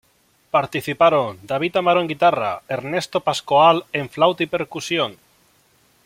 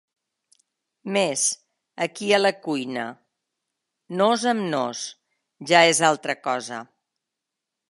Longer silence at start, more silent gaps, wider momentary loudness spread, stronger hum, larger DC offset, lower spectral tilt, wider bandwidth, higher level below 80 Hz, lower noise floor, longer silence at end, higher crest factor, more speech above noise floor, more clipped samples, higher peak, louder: second, 0.55 s vs 1.05 s; neither; second, 10 LU vs 18 LU; neither; neither; first, -4.5 dB/octave vs -2.5 dB/octave; first, 16.5 kHz vs 11.5 kHz; first, -60 dBFS vs -78 dBFS; second, -60 dBFS vs -84 dBFS; second, 0.9 s vs 1.05 s; second, 18 dB vs 24 dB; second, 41 dB vs 62 dB; neither; about the same, -2 dBFS vs -2 dBFS; first, -19 LUFS vs -22 LUFS